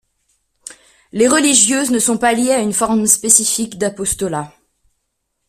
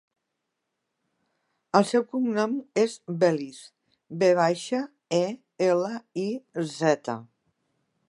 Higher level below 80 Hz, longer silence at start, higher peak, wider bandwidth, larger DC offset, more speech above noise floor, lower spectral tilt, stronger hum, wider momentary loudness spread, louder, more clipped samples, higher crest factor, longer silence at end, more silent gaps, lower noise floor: first, -48 dBFS vs -80 dBFS; second, 1.15 s vs 1.75 s; first, 0 dBFS vs -4 dBFS; first, 16 kHz vs 11.5 kHz; neither; about the same, 57 dB vs 56 dB; second, -2 dB/octave vs -5.5 dB/octave; neither; about the same, 12 LU vs 10 LU; first, -13 LUFS vs -26 LUFS; neither; second, 16 dB vs 24 dB; first, 1 s vs 0.85 s; neither; second, -71 dBFS vs -81 dBFS